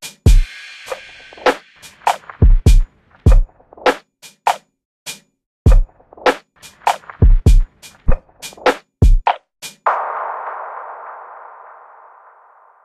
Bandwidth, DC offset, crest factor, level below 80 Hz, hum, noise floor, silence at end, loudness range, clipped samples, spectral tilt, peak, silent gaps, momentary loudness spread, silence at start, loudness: 13 kHz; under 0.1%; 16 dB; -16 dBFS; none; -48 dBFS; 1.7 s; 4 LU; under 0.1%; -6 dB/octave; 0 dBFS; 4.85-5.06 s, 5.46-5.65 s; 18 LU; 0.05 s; -18 LUFS